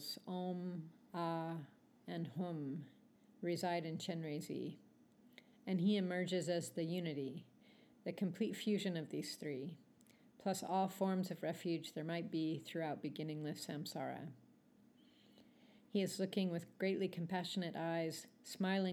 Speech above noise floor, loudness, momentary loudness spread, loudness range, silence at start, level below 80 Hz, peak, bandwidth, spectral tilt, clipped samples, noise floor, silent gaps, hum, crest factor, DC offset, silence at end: 27 dB; -42 LUFS; 11 LU; 4 LU; 0 s; under -90 dBFS; -26 dBFS; 17.5 kHz; -5.5 dB/octave; under 0.1%; -69 dBFS; none; none; 18 dB; under 0.1%; 0 s